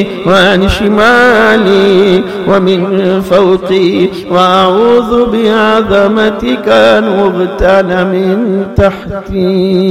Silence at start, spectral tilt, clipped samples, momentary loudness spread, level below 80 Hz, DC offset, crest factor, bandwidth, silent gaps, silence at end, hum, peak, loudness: 0 s; -6 dB/octave; 0.4%; 5 LU; -30 dBFS; 0.6%; 8 dB; 15 kHz; none; 0 s; none; 0 dBFS; -8 LUFS